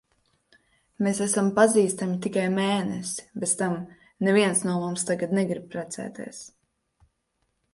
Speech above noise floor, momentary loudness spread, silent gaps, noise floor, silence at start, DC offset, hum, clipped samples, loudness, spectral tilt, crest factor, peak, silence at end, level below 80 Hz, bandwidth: 50 dB; 15 LU; none; -75 dBFS; 1 s; under 0.1%; none; under 0.1%; -25 LUFS; -4.5 dB/octave; 22 dB; -4 dBFS; 1.25 s; -68 dBFS; 11.5 kHz